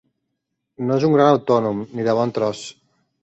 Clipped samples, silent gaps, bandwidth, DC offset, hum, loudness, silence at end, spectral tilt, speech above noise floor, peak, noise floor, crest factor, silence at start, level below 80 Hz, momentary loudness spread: under 0.1%; none; 8.2 kHz; under 0.1%; none; -19 LUFS; 0.5 s; -7 dB/octave; 59 dB; -4 dBFS; -77 dBFS; 18 dB; 0.8 s; -62 dBFS; 13 LU